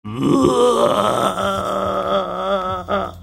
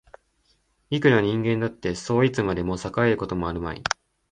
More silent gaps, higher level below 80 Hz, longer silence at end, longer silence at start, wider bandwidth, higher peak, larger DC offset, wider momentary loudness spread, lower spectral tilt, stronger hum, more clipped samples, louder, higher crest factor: neither; about the same, -44 dBFS vs -46 dBFS; second, 0 s vs 0.4 s; second, 0.05 s vs 0.9 s; first, 16.5 kHz vs 9.8 kHz; first, 0 dBFS vs -4 dBFS; neither; about the same, 7 LU vs 9 LU; about the same, -5.5 dB/octave vs -6 dB/octave; neither; neither; first, -18 LUFS vs -24 LUFS; about the same, 18 dB vs 22 dB